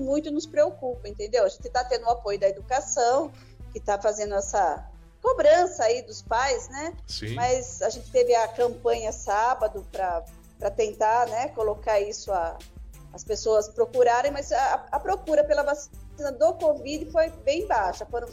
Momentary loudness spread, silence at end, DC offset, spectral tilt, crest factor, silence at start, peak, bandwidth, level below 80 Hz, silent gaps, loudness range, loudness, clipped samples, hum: 12 LU; 0 s; under 0.1%; -3.5 dB/octave; 16 dB; 0 s; -10 dBFS; 14.5 kHz; -46 dBFS; none; 2 LU; -25 LUFS; under 0.1%; none